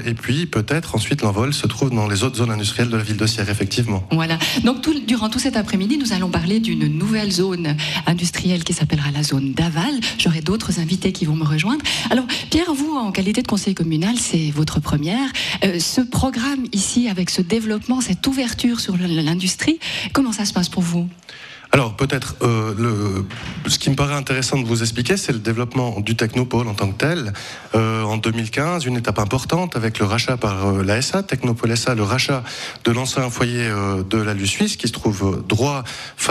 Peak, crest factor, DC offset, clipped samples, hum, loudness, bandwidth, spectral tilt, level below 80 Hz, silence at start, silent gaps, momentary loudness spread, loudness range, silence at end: 0 dBFS; 18 dB; under 0.1%; under 0.1%; none; -19 LUFS; 14 kHz; -4.5 dB/octave; -42 dBFS; 0 s; none; 3 LU; 1 LU; 0 s